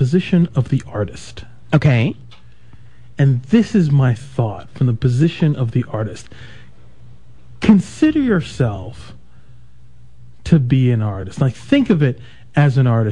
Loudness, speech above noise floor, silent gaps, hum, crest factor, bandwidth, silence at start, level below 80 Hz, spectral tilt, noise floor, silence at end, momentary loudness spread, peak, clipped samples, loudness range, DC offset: -17 LUFS; 31 dB; none; none; 18 dB; 10 kHz; 0 s; -44 dBFS; -8 dB/octave; -47 dBFS; 0 s; 13 LU; 0 dBFS; under 0.1%; 3 LU; 1%